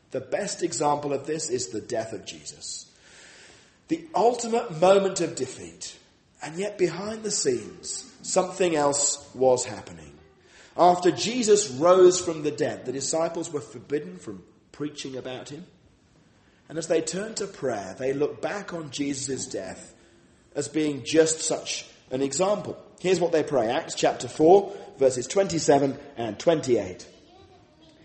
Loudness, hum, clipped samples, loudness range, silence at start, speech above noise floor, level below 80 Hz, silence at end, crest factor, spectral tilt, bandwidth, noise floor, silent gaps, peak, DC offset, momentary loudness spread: -25 LUFS; none; under 0.1%; 10 LU; 0.1 s; 34 dB; -64 dBFS; 1 s; 22 dB; -4 dB/octave; 8.8 kHz; -59 dBFS; none; -4 dBFS; under 0.1%; 17 LU